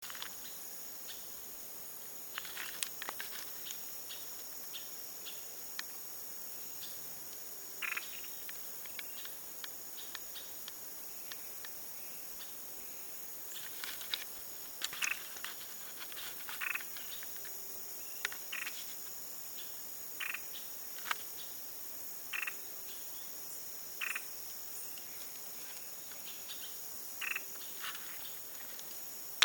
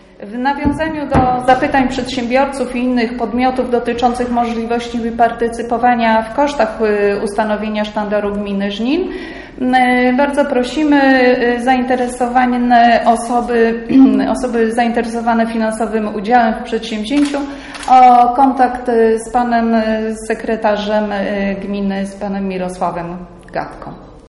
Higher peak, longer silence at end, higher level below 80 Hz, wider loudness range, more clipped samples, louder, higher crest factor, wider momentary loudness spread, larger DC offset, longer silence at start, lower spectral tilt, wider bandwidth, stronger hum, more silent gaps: second, -6 dBFS vs 0 dBFS; about the same, 0 s vs 0.1 s; second, -80 dBFS vs -38 dBFS; about the same, 3 LU vs 5 LU; neither; second, -41 LUFS vs -14 LUFS; first, 38 dB vs 14 dB; second, 5 LU vs 10 LU; neither; second, 0 s vs 0.2 s; second, 1 dB/octave vs -5.5 dB/octave; first, over 20 kHz vs 11.5 kHz; neither; neither